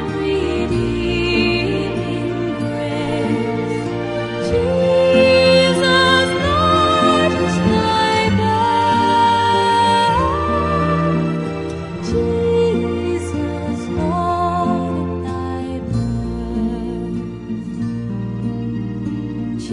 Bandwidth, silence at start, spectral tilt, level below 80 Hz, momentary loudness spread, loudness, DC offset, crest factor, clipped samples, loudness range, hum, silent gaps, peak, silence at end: 11 kHz; 0 s; -6 dB/octave; -36 dBFS; 11 LU; -17 LUFS; under 0.1%; 16 dB; under 0.1%; 10 LU; none; none; -2 dBFS; 0 s